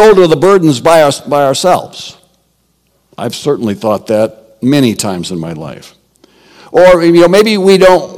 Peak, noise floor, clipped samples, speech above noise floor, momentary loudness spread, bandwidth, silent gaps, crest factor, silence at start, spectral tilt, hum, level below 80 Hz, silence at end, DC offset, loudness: 0 dBFS; -57 dBFS; 4%; 48 dB; 16 LU; 17 kHz; none; 10 dB; 0 s; -5 dB/octave; none; -42 dBFS; 0 s; under 0.1%; -9 LUFS